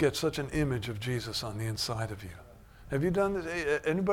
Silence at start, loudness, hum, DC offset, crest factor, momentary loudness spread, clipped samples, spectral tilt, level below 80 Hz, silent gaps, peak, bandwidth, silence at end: 0 s; -32 LUFS; none; under 0.1%; 16 dB; 9 LU; under 0.1%; -5.5 dB/octave; -50 dBFS; none; -16 dBFS; 18 kHz; 0 s